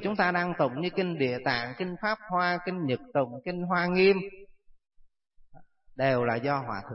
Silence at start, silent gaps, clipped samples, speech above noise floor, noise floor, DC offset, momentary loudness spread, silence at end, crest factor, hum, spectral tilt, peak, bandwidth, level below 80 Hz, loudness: 0 s; none; under 0.1%; 29 dB; -57 dBFS; under 0.1%; 8 LU; 0 s; 16 dB; none; -9.5 dB/octave; -12 dBFS; 5.8 kHz; -62 dBFS; -28 LUFS